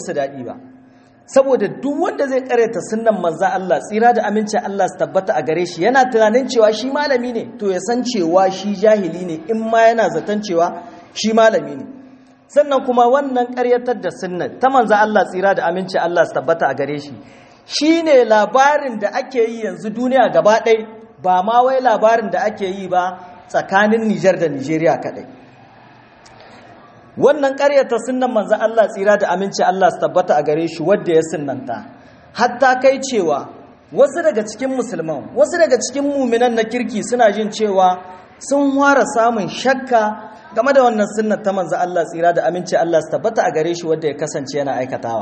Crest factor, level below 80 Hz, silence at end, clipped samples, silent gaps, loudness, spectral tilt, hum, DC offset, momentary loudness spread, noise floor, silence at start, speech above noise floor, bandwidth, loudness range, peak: 16 dB; -64 dBFS; 0 s; under 0.1%; none; -16 LUFS; -4.5 dB/octave; none; under 0.1%; 10 LU; -47 dBFS; 0 s; 31 dB; 8.8 kHz; 3 LU; 0 dBFS